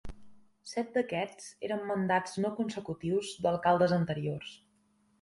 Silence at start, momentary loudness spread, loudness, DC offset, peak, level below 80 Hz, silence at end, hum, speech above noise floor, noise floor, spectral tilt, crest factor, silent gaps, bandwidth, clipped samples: 0.05 s; 13 LU; -32 LUFS; under 0.1%; -12 dBFS; -60 dBFS; 0.65 s; none; 39 dB; -70 dBFS; -6 dB/octave; 20 dB; none; 11.5 kHz; under 0.1%